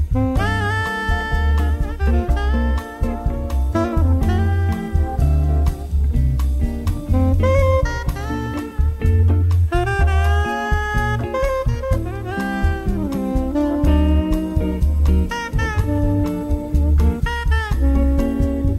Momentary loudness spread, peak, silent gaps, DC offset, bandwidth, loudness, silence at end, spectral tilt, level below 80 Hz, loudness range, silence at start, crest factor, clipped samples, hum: 6 LU; -4 dBFS; none; under 0.1%; 13 kHz; -19 LUFS; 0 s; -7.5 dB/octave; -20 dBFS; 2 LU; 0 s; 12 dB; under 0.1%; none